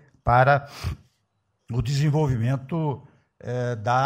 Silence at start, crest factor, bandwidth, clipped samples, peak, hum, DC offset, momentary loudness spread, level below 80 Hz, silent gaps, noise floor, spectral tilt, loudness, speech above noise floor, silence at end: 0.25 s; 18 dB; 14 kHz; under 0.1%; -6 dBFS; none; under 0.1%; 15 LU; -44 dBFS; none; -73 dBFS; -7 dB/octave; -24 LUFS; 50 dB; 0 s